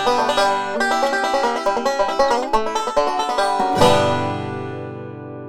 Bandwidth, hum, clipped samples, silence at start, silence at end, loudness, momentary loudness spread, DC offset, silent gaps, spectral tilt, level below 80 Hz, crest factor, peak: 17 kHz; none; under 0.1%; 0 s; 0 s; -19 LUFS; 13 LU; under 0.1%; none; -4 dB/octave; -44 dBFS; 18 dB; 0 dBFS